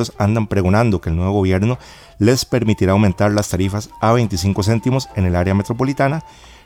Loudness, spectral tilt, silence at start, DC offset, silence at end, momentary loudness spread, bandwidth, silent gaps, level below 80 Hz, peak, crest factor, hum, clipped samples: -17 LUFS; -6.5 dB/octave; 0 s; under 0.1%; 0.35 s; 5 LU; 16.5 kHz; none; -40 dBFS; -2 dBFS; 14 dB; none; under 0.1%